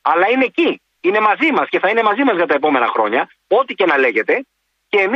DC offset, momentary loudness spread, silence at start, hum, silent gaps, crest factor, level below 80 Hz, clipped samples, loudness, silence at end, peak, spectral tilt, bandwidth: under 0.1%; 5 LU; 0.05 s; none; none; 14 dB; -66 dBFS; under 0.1%; -15 LUFS; 0 s; -2 dBFS; -5.5 dB/octave; 6.8 kHz